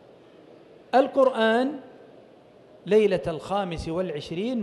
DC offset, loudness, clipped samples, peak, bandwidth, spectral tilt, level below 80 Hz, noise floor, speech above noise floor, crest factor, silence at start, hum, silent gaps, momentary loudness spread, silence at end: under 0.1%; -24 LUFS; under 0.1%; -8 dBFS; 11.5 kHz; -6 dB/octave; -52 dBFS; -52 dBFS; 29 dB; 18 dB; 0.95 s; none; none; 10 LU; 0 s